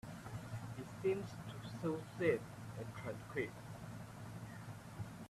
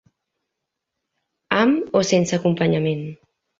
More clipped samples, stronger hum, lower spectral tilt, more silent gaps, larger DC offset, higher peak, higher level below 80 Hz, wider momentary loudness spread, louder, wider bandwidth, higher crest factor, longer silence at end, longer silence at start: neither; neither; about the same, -6.5 dB/octave vs -5.5 dB/octave; neither; neither; second, -22 dBFS vs -2 dBFS; second, -68 dBFS vs -60 dBFS; first, 13 LU vs 8 LU; second, -44 LUFS vs -20 LUFS; first, 14.5 kHz vs 7.8 kHz; about the same, 22 dB vs 20 dB; second, 0 s vs 0.45 s; second, 0.05 s vs 1.5 s